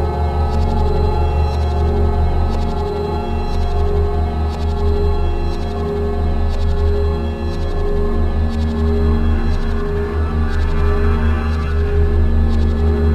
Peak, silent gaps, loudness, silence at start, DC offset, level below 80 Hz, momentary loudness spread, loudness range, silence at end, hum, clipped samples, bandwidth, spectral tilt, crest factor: -4 dBFS; none; -19 LUFS; 0 s; under 0.1%; -18 dBFS; 4 LU; 2 LU; 0 s; none; under 0.1%; 7.2 kHz; -8.5 dB/octave; 12 dB